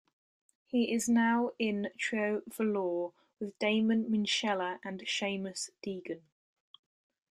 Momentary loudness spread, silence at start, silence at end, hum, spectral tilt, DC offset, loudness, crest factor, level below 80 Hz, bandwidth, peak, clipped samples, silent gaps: 13 LU; 0.75 s; 1.15 s; none; -4 dB/octave; under 0.1%; -32 LUFS; 18 dB; -76 dBFS; 13 kHz; -16 dBFS; under 0.1%; none